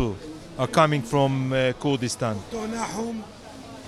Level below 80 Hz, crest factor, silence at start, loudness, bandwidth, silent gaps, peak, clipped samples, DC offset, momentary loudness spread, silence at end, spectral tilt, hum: -50 dBFS; 20 dB; 0 s; -25 LUFS; 14 kHz; none; -4 dBFS; under 0.1%; under 0.1%; 17 LU; 0 s; -5.5 dB/octave; none